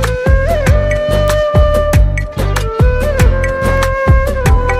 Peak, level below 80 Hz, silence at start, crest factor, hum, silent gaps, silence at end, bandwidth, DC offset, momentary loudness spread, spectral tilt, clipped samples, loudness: 0 dBFS; -14 dBFS; 0 s; 10 dB; none; none; 0 s; 15.5 kHz; under 0.1%; 4 LU; -6 dB/octave; under 0.1%; -13 LUFS